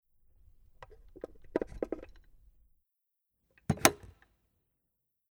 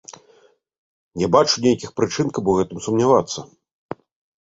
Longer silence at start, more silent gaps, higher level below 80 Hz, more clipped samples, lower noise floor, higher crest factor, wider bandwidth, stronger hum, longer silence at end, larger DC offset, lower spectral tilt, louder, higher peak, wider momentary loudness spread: first, 1.5 s vs 0.1 s; second, none vs 0.78-1.11 s; about the same, -56 dBFS vs -52 dBFS; neither; first, -84 dBFS vs -56 dBFS; first, 38 dB vs 20 dB; first, over 20 kHz vs 8 kHz; neither; first, 1.35 s vs 0.95 s; neither; second, -3.5 dB/octave vs -5 dB/octave; second, -32 LUFS vs -19 LUFS; about the same, -2 dBFS vs -2 dBFS; about the same, 23 LU vs 21 LU